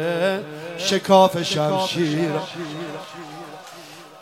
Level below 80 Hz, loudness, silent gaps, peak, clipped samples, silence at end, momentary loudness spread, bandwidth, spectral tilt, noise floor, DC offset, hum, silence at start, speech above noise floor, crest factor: -66 dBFS; -21 LUFS; none; -2 dBFS; under 0.1%; 0 s; 23 LU; 16 kHz; -4.5 dB/octave; -41 dBFS; under 0.1%; none; 0 s; 21 dB; 20 dB